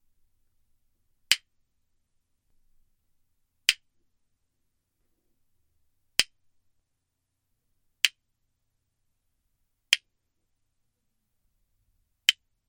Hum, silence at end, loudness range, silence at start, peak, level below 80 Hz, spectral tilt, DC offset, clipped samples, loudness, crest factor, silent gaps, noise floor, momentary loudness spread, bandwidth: none; 0.35 s; 4 LU; 1.3 s; -2 dBFS; -72 dBFS; 3 dB/octave; under 0.1%; under 0.1%; -27 LUFS; 34 dB; none; -80 dBFS; 2 LU; 17 kHz